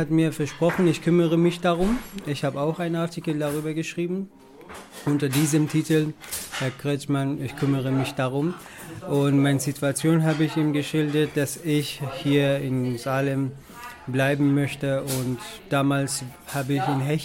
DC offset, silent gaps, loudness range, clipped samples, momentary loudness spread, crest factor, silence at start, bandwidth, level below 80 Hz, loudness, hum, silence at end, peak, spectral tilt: under 0.1%; none; 3 LU; under 0.1%; 10 LU; 14 dB; 0 s; 16.5 kHz; -50 dBFS; -24 LUFS; none; 0 s; -10 dBFS; -6 dB/octave